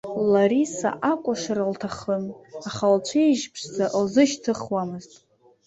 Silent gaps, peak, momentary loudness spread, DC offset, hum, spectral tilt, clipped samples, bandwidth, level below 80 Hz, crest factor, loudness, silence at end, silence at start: none; -6 dBFS; 12 LU; under 0.1%; none; -5 dB/octave; under 0.1%; 8.2 kHz; -62 dBFS; 18 dB; -23 LUFS; 0.6 s; 0.05 s